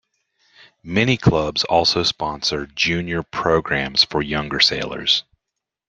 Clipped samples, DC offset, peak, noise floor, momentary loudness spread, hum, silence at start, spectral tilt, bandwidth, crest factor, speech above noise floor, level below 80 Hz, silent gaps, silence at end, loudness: under 0.1%; under 0.1%; -2 dBFS; -82 dBFS; 6 LU; none; 0.85 s; -4 dB/octave; 9.6 kHz; 20 dB; 63 dB; -44 dBFS; none; 0.7 s; -19 LUFS